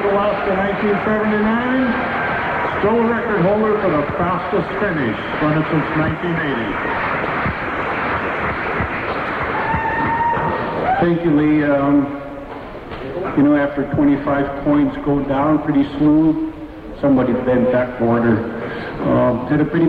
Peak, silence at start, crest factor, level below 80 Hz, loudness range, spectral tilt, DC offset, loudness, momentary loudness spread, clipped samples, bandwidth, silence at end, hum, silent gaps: -6 dBFS; 0 s; 12 dB; -40 dBFS; 3 LU; -9 dB/octave; under 0.1%; -18 LUFS; 6 LU; under 0.1%; 5.2 kHz; 0 s; none; none